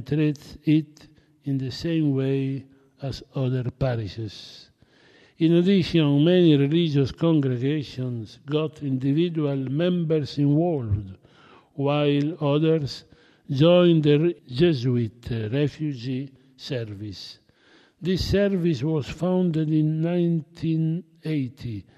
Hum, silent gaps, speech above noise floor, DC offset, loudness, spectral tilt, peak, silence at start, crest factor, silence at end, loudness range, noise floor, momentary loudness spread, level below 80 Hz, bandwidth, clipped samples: none; none; 35 dB; under 0.1%; -23 LUFS; -8 dB/octave; -6 dBFS; 0 s; 18 dB; 0.15 s; 7 LU; -57 dBFS; 16 LU; -50 dBFS; 8.2 kHz; under 0.1%